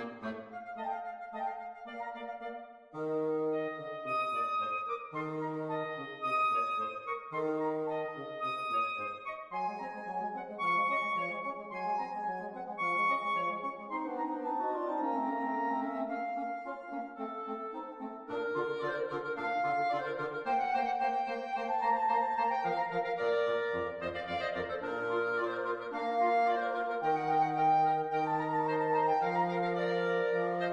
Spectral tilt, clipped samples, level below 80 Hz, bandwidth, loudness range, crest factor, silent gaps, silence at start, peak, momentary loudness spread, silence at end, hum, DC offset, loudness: -6.5 dB/octave; under 0.1%; -74 dBFS; 10.5 kHz; 7 LU; 14 dB; none; 0 s; -20 dBFS; 11 LU; 0 s; none; under 0.1%; -34 LUFS